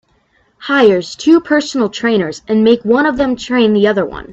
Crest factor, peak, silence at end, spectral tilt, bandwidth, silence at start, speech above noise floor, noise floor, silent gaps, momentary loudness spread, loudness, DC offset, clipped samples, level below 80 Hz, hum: 12 dB; 0 dBFS; 0 s; -5.5 dB/octave; 8 kHz; 0.6 s; 44 dB; -56 dBFS; none; 6 LU; -13 LUFS; under 0.1%; under 0.1%; -46 dBFS; none